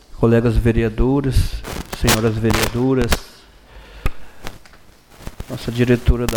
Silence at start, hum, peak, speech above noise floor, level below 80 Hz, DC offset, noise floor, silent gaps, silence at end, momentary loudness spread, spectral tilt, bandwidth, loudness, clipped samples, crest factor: 0.15 s; none; -4 dBFS; 30 dB; -26 dBFS; under 0.1%; -46 dBFS; none; 0 s; 21 LU; -5.5 dB/octave; over 20 kHz; -18 LUFS; under 0.1%; 16 dB